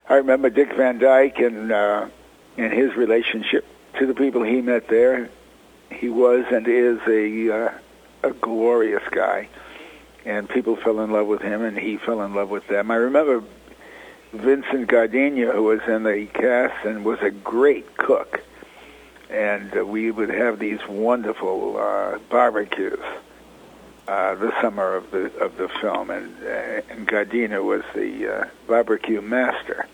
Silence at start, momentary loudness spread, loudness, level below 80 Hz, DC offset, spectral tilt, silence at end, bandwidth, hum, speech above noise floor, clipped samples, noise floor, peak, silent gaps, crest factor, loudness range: 0.05 s; 11 LU; -21 LUFS; -58 dBFS; under 0.1%; -6 dB/octave; 0.05 s; 10.5 kHz; none; 29 dB; under 0.1%; -50 dBFS; 0 dBFS; none; 22 dB; 5 LU